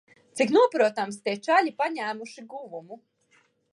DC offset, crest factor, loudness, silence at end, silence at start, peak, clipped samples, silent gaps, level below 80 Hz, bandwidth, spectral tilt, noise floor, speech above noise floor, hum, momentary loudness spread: under 0.1%; 18 dB; -24 LUFS; 0.75 s; 0.35 s; -8 dBFS; under 0.1%; none; -84 dBFS; 11.5 kHz; -4 dB/octave; -65 dBFS; 40 dB; none; 20 LU